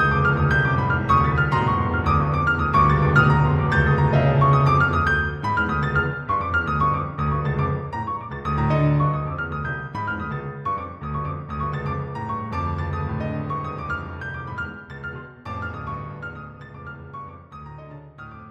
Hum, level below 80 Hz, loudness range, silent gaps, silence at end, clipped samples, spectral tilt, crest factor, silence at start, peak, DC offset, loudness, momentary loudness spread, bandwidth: none; -36 dBFS; 15 LU; none; 0 s; under 0.1%; -8.5 dB/octave; 18 dB; 0 s; -4 dBFS; under 0.1%; -22 LUFS; 19 LU; 6.8 kHz